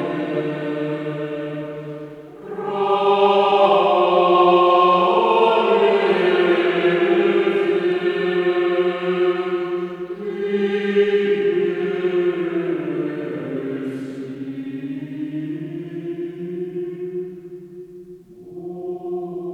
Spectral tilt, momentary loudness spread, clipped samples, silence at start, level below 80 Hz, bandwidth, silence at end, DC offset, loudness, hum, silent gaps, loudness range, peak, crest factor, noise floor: -7 dB/octave; 16 LU; under 0.1%; 0 s; -66 dBFS; 6.4 kHz; 0 s; under 0.1%; -19 LUFS; none; none; 14 LU; -2 dBFS; 16 dB; -41 dBFS